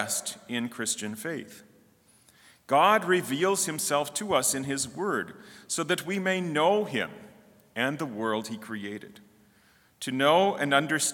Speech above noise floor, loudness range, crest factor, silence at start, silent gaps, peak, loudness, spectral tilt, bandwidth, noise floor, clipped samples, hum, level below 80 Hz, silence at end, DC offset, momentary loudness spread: 34 dB; 5 LU; 22 dB; 0 s; none; -6 dBFS; -27 LUFS; -3 dB/octave; 18 kHz; -62 dBFS; under 0.1%; none; -74 dBFS; 0 s; under 0.1%; 14 LU